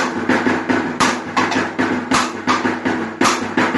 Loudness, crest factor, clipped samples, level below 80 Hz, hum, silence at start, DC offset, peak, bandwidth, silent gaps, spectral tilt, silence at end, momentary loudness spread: -18 LUFS; 16 dB; under 0.1%; -52 dBFS; none; 0 s; under 0.1%; -2 dBFS; 11.5 kHz; none; -3.5 dB/octave; 0 s; 3 LU